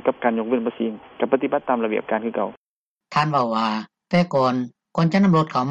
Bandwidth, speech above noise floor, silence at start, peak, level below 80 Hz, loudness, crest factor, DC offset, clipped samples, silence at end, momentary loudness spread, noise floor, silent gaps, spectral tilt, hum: 8 kHz; 28 dB; 0.05 s; -4 dBFS; -62 dBFS; -22 LUFS; 18 dB; under 0.1%; under 0.1%; 0 s; 10 LU; -49 dBFS; 2.57-2.99 s; -7.5 dB/octave; none